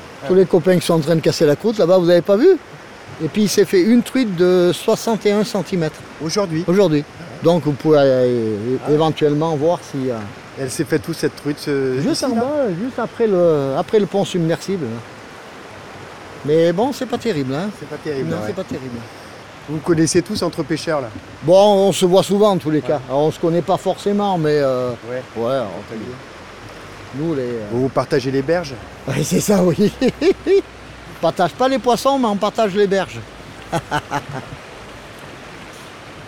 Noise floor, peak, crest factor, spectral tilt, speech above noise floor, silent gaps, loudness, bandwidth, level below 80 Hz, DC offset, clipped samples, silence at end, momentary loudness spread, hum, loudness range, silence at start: -37 dBFS; -2 dBFS; 16 dB; -5.5 dB/octave; 20 dB; none; -17 LUFS; 17 kHz; -50 dBFS; 0.2%; under 0.1%; 0 s; 21 LU; none; 7 LU; 0 s